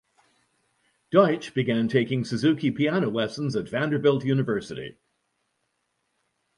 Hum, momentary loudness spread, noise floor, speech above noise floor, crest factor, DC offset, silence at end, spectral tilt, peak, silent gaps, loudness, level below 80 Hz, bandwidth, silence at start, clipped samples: none; 8 LU; -76 dBFS; 52 dB; 20 dB; under 0.1%; 1.65 s; -7 dB/octave; -6 dBFS; none; -24 LUFS; -64 dBFS; 11.5 kHz; 1.1 s; under 0.1%